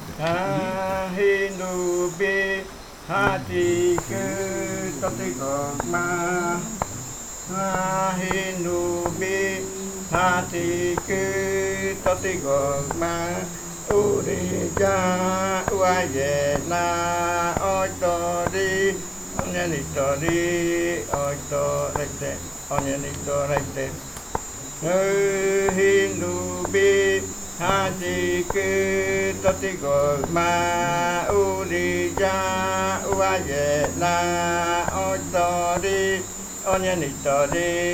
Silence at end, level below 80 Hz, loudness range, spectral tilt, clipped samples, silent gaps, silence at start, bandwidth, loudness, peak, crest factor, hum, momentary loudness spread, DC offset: 0 s; -46 dBFS; 4 LU; -4 dB/octave; under 0.1%; none; 0 s; 19.5 kHz; -23 LUFS; -2 dBFS; 22 dB; none; 7 LU; under 0.1%